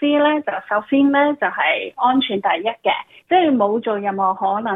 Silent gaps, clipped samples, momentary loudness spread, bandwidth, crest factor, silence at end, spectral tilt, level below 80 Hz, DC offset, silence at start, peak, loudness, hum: none; under 0.1%; 6 LU; 3.9 kHz; 14 dB; 0 s; -7.5 dB/octave; -70 dBFS; under 0.1%; 0 s; -4 dBFS; -18 LUFS; none